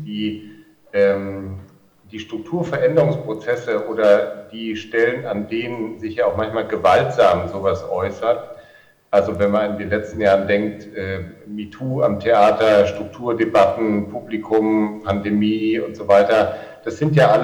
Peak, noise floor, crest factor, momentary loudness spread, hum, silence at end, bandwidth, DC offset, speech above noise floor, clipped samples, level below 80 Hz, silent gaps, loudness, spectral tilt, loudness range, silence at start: -2 dBFS; -50 dBFS; 18 dB; 14 LU; none; 0 s; 20 kHz; under 0.1%; 31 dB; under 0.1%; -52 dBFS; none; -19 LUFS; -7 dB/octave; 3 LU; 0 s